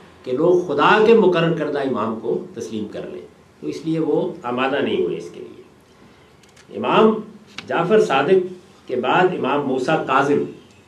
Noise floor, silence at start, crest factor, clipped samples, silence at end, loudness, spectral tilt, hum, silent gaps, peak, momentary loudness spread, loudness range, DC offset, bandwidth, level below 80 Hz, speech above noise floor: -49 dBFS; 0.25 s; 18 dB; under 0.1%; 0.3 s; -19 LUFS; -6.5 dB/octave; none; none; -2 dBFS; 17 LU; 6 LU; under 0.1%; 10.5 kHz; -62 dBFS; 31 dB